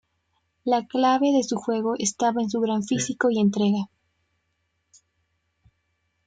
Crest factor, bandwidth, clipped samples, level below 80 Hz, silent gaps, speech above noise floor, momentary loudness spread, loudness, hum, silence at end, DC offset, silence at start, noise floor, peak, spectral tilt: 16 dB; 9.4 kHz; under 0.1%; -68 dBFS; none; 52 dB; 5 LU; -23 LUFS; none; 2.4 s; under 0.1%; 0.65 s; -74 dBFS; -10 dBFS; -4.5 dB/octave